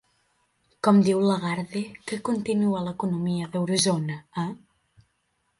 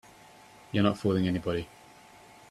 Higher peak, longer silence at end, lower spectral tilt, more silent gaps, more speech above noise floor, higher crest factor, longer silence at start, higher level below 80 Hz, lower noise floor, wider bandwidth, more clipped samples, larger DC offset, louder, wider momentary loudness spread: first, -6 dBFS vs -10 dBFS; first, 1 s vs 0.85 s; second, -5.5 dB/octave vs -7 dB/octave; neither; first, 49 dB vs 26 dB; about the same, 20 dB vs 20 dB; about the same, 0.85 s vs 0.75 s; about the same, -64 dBFS vs -60 dBFS; first, -73 dBFS vs -54 dBFS; second, 11.5 kHz vs 13.5 kHz; neither; neither; first, -25 LUFS vs -29 LUFS; first, 13 LU vs 9 LU